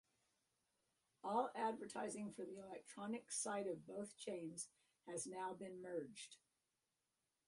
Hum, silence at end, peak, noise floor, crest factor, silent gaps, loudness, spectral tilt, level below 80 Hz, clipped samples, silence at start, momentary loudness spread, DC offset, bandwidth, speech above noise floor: none; 1.1 s; -28 dBFS; under -90 dBFS; 22 dB; none; -48 LUFS; -3.5 dB/octave; -90 dBFS; under 0.1%; 1.25 s; 12 LU; under 0.1%; 11.5 kHz; over 40 dB